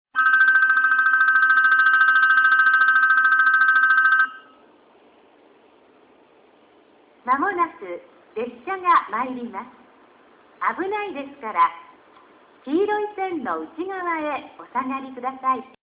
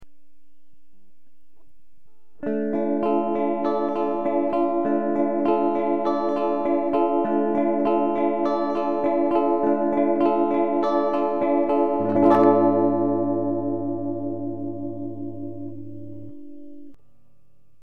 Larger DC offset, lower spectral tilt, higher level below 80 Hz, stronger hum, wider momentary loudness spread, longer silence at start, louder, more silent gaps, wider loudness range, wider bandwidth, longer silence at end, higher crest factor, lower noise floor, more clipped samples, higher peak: second, under 0.1% vs 2%; second, -5.5 dB/octave vs -9 dB/octave; second, -70 dBFS vs -60 dBFS; neither; first, 17 LU vs 13 LU; first, 0.15 s vs 0 s; first, -18 LUFS vs -22 LUFS; neither; first, 14 LU vs 10 LU; second, 4 kHz vs 5.6 kHz; first, 0.2 s vs 0 s; about the same, 16 dB vs 18 dB; second, -54 dBFS vs -68 dBFS; neither; about the same, -6 dBFS vs -4 dBFS